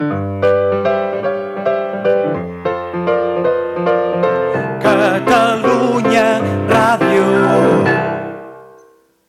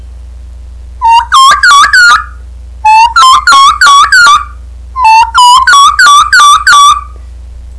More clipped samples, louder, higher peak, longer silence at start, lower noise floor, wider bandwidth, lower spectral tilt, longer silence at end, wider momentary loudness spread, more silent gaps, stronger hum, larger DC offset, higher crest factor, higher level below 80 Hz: second, under 0.1% vs 8%; second, -15 LUFS vs -2 LUFS; about the same, -2 dBFS vs 0 dBFS; about the same, 0 s vs 0 s; first, -49 dBFS vs -24 dBFS; first, 14.5 kHz vs 11 kHz; first, -6.5 dB/octave vs 1 dB/octave; first, 0.6 s vs 0 s; about the same, 8 LU vs 7 LU; neither; neither; second, under 0.1% vs 0.7%; first, 12 dB vs 4 dB; second, -52 dBFS vs -26 dBFS